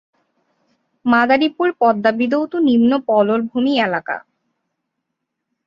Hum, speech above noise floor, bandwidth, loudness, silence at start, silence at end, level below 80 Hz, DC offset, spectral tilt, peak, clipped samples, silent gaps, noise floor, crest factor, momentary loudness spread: none; 61 dB; 5.8 kHz; -16 LUFS; 1.05 s; 1.5 s; -62 dBFS; under 0.1%; -7 dB/octave; -2 dBFS; under 0.1%; none; -77 dBFS; 16 dB; 8 LU